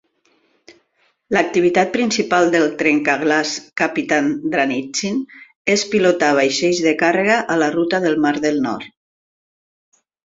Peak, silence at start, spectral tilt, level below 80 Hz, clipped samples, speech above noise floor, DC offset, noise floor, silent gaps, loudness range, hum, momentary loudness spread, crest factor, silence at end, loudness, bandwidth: 0 dBFS; 0.7 s; -4 dB/octave; -60 dBFS; under 0.1%; 46 dB; under 0.1%; -63 dBFS; 5.56-5.65 s; 2 LU; none; 7 LU; 18 dB; 1.4 s; -17 LUFS; 7.8 kHz